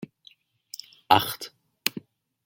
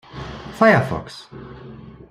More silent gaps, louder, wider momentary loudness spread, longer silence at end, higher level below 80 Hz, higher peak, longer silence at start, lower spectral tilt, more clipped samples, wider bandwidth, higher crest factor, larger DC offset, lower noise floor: neither; second, -25 LUFS vs -17 LUFS; second, 21 LU vs 24 LU; first, 0.45 s vs 0.2 s; second, -68 dBFS vs -46 dBFS; about the same, 0 dBFS vs -2 dBFS; second, 0 s vs 0.15 s; second, -3 dB/octave vs -7 dB/octave; neither; first, 17 kHz vs 14 kHz; first, 30 dB vs 20 dB; neither; first, -58 dBFS vs -39 dBFS